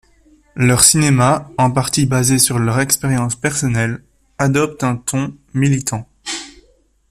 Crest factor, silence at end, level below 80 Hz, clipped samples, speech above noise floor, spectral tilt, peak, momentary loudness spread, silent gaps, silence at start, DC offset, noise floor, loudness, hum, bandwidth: 16 dB; 0.6 s; -44 dBFS; under 0.1%; 40 dB; -4 dB/octave; 0 dBFS; 16 LU; none; 0.55 s; under 0.1%; -55 dBFS; -15 LUFS; none; 16 kHz